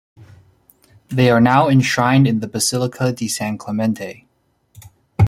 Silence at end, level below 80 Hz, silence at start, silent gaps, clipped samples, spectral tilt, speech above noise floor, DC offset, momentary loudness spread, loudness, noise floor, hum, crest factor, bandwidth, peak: 0 s; -50 dBFS; 1.1 s; none; under 0.1%; -5.5 dB/octave; 44 dB; under 0.1%; 12 LU; -17 LUFS; -60 dBFS; none; 16 dB; 14.5 kHz; -2 dBFS